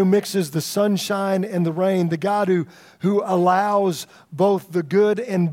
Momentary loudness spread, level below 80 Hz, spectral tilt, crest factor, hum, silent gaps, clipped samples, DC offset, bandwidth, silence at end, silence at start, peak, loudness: 5 LU; -72 dBFS; -6 dB/octave; 14 dB; none; none; under 0.1%; under 0.1%; 16.5 kHz; 0 s; 0 s; -6 dBFS; -20 LUFS